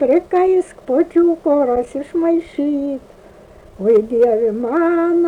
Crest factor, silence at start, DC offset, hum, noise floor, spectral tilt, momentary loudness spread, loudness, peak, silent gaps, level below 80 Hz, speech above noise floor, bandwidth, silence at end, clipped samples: 10 dB; 0 s; under 0.1%; none; -42 dBFS; -7.5 dB/octave; 7 LU; -16 LUFS; -6 dBFS; none; -50 dBFS; 27 dB; 10 kHz; 0 s; under 0.1%